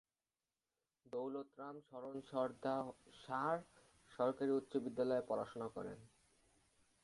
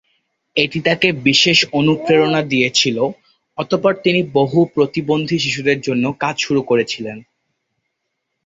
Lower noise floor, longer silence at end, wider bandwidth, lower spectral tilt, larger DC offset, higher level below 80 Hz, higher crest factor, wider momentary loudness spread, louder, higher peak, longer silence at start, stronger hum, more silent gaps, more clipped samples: first, under -90 dBFS vs -74 dBFS; second, 1 s vs 1.25 s; first, 11.5 kHz vs 8 kHz; first, -7 dB/octave vs -4.5 dB/octave; neither; second, -80 dBFS vs -56 dBFS; about the same, 20 dB vs 18 dB; first, 13 LU vs 9 LU; second, -43 LUFS vs -16 LUFS; second, -24 dBFS vs 0 dBFS; first, 1.15 s vs 0.55 s; neither; neither; neither